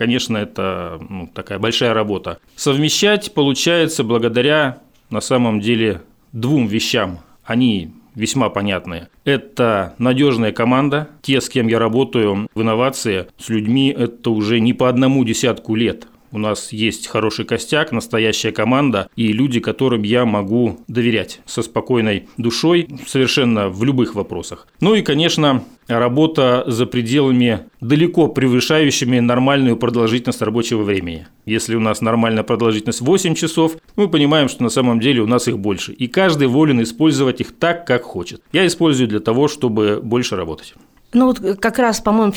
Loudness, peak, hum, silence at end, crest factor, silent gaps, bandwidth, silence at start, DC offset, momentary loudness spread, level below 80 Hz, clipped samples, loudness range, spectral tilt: -16 LUFS; -2 dBFS; none; 0 s; 14 dB; none; 17.5 kHz; 0 s; under 0.1%; 8 LU; -50 dBFS; under 0.1%; 3 LU; -5 dB/octave